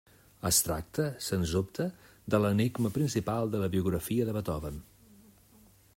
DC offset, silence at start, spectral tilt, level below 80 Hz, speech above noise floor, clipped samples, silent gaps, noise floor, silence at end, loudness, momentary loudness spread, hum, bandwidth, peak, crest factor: under 0.1%; 0.45 s; -5 dB/octave; -52 dBFS; 30 dB; under 0.1%; none; -60 dBFS; 1.15 s; -31 LUFS; 11 LU; none; 16 kHz; -10 dBFS; 22 dB